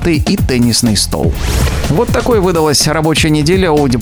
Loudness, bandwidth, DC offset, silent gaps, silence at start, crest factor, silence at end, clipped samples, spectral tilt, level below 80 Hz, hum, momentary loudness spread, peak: -11 LUFS; over 20 kHz; under 0.1%; none; 0 s; 12 dB; 0 s; under 0.1%; -4.5 dB/octave; -22 dBFS; none; 4 LU; 0 dBFS